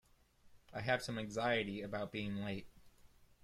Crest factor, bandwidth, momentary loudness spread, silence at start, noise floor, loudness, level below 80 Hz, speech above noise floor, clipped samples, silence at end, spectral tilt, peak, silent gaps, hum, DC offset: 20 dB; 14.5 kHz; 9 LU; 0.45 s; -67 dBFS; -40 LUFS; -68 dBFS; 28 dB; under 0.1%; 0.2 s; -5 dB/octave; -22 dBFS; none; none; under 0.1%